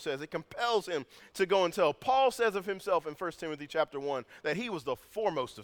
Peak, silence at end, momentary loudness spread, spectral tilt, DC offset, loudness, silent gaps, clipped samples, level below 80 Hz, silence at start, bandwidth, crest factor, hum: -14 dBFS; 0 s; 11 LU; -4 dB/octave; under 0.1%; -32 LUFS; none; under 0.1%; -68 dBFS; 0 s; 19.5 kHz; 18 dB; none